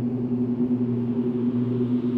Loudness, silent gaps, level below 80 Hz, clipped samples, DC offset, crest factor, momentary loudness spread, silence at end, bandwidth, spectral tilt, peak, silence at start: -25 LUFS; none; -58 dBFS; under 0.1%; under 0.1%; 10 dB; 1 LU; 0 s; 4 kHz; -11.5 dB/octave; -14 dBFS; 0 s